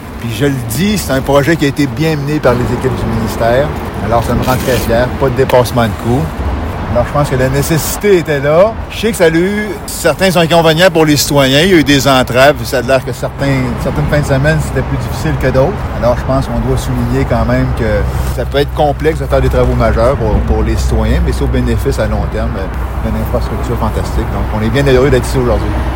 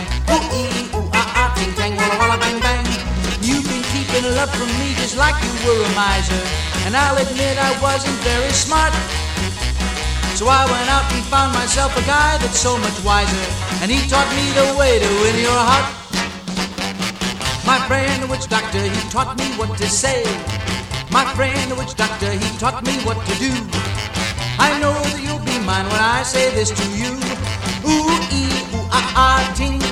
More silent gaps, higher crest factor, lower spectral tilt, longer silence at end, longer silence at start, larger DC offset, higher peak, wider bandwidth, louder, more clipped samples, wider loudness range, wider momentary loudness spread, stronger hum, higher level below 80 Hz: neither; about the same, 12 dB vs 16 dB; first, -5.5 dB/octave vs -3.5 dB/octave; about the same, 0 s vs 0 s; about the same, 0 s vs 0 s; neither; about the same, 0 dBFS vs -2 dBFS; about the same, 17 kHz vs 16 kHz; first, -12 LUFS vs -17 LUFS; first, 0.5% vs under 0.1%; about the same, 5 LU vs 3 LU; about the same, 8 LU vs 7 LU; neither; first, -20 dBFS vs -28 dBFS